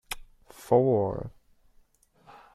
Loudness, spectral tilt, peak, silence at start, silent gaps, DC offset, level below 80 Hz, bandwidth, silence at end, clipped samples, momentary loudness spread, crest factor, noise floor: -26 LUFS; -7 dB/octave; -8 dBFS; 0.1 s; none; under 0.1%; -54 dBFS; 14.5 kHz; 1.25 s; under 0.1%; 21 LU; 22 dB; -62 dBFS